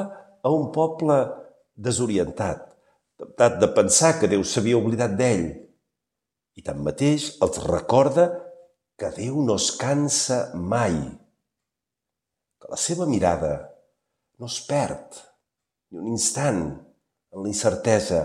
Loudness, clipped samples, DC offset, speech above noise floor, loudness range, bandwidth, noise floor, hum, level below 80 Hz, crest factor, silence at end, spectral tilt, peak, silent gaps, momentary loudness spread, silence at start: -23 LUFS; under 0.1%; under 0.1%; 63 dB; 7 LU; 15 kHz; -86 dBFS; none; -52 dBFS; 20 dB; 0 s; -4.5 dB/octave; -4 dBFS; none; 16 LU; 0 s